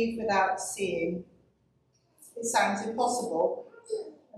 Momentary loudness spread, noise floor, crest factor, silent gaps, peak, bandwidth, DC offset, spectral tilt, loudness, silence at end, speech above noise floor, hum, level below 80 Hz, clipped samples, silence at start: 11 LU; -69 dBFS; 20 dB; none; -12 dBFS; 14.5 kHz; under 0.1%; -3.5 dB/octave; -30 LUFS; 0 s; 40 dB; none; -66 dBFS; under 0.1%; 0 s